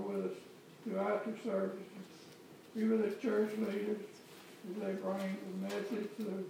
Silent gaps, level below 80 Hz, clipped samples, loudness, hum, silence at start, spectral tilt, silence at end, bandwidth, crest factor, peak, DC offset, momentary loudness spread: none; under -90 dBFS; under 0.1%; -38 LUFS; none; 0 s; -6.5 dB/octave; 0 s; 16.5 kHz; 16 dB; -24 dBFS; under 0.1%; 19 LU